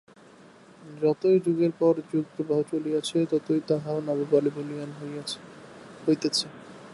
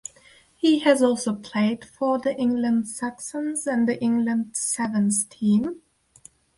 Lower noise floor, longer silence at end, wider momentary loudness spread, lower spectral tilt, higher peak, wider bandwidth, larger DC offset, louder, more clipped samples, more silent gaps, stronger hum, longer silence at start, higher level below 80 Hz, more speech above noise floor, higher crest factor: about the same, -52 dBFS vs -55 dBFS; second, 0 s vs 0.85 s; first, 15 LU vs 10 LU; first, -6 dB/octave vs -4.5 dB/octave; second, -10 dBFS vs -4 dBFS; about the same, 11.5 kHz vs 11.5 kHz; neither; second, -26 LUFS vs -23 LUFS; neither; neither; neither; first, 0.8 s vs 0.65 s; second, -74 dBFS vs -64 dBFS; second, 26 dB vs 32 dB; about the same, 18 dB vs 18 dB